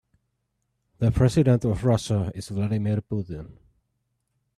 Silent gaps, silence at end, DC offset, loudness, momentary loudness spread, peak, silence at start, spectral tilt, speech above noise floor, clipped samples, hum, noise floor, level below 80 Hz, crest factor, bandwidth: none; 1.05 s; under 0.1%; -24 LUFS; 11 LU; -8 dBFS; 1 s; -7.5 dB/octave; 53 dB; under 0.1%; none; -76 dBFS; -44 dBFS; 18 dB; 12 kHz